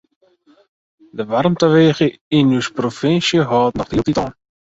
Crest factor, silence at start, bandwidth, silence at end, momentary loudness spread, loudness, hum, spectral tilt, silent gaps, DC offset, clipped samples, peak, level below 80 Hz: 16 dB; 1.15 s; 8 kHz; 0.45 s; 9 LU; -16 LUFS; none; -6 dB/octave; 2.21-2.31 s; under 0.1%; under 0.1%; -2 dBFS; -46 dBFS